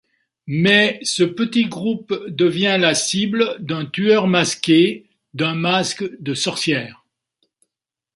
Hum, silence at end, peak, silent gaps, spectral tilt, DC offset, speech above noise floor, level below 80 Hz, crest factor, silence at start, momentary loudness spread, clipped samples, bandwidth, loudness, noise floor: none; 1.25 s; 0 dBFS; none; -4 dB/octave; under 0.1%; 66 dB; -62 dBFS; 18 dB; 0.45 s; 11 LU; under 0.1%; 11.5 kHz; -18 LUFS; -84 dBFS